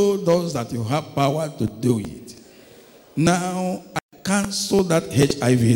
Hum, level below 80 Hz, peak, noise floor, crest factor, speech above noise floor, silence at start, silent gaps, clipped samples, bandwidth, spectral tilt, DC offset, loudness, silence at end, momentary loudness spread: none; -52 dBFS; -4 dBFS; -48 dBFS; 16 dB; 28 dB; 0 s; 4.01-4.09 s; under 0.1%; 18 kHz; -5.5 dB/octave; under 0.1%; -22 LUFS; 0 s; 11 LU